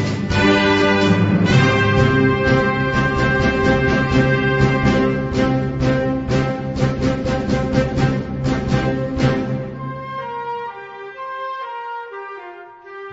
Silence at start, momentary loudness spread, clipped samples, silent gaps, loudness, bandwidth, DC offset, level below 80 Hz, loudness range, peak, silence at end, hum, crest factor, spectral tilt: 0 s; 15 LU; under 0.1%; none; -18 LUFS; 8 kHz; under 0.1%; -32 dBFS; 9 LU; -2 dBFS; 0 s; none; 16 dB; -6.5 dB/octave